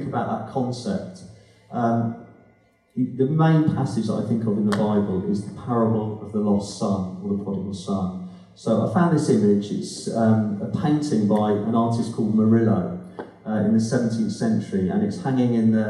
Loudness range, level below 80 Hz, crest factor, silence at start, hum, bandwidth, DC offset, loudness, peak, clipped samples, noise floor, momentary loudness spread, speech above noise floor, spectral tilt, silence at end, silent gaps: 4 LU; -60 dBFS; 14 dB; 0 s; none; 11 kHz; under 0.1%; -23 LUFS; -8 dBFS; under 0.1%; -58 dBFS; 10 LU; 37 dB; -7.5 dB/octave; 0 s; none